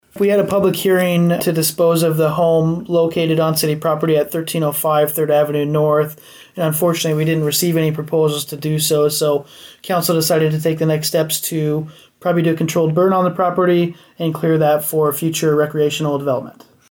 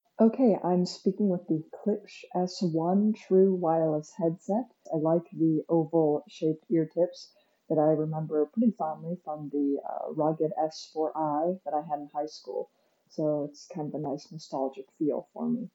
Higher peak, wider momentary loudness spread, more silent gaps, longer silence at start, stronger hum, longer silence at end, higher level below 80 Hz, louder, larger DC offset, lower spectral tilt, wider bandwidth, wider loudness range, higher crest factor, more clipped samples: first, -6 dBFS vs -12 dBFS; second, 6 LU vs 11 LU; neither; about the same, 0.15 s vs 0.2 s; neither; first, 0.4 s vs 0.05 s; first, -56 dBFS vs -88 dBFS; first, -16 LUFS vs -29 LUFS; neither; second, -5.5 dB/octave vs -8 dB/octave; first, over 20 kHz vs 8 kHz; second, 2 LU vs 7 LU; second, 10 dB vs 18 dB; neither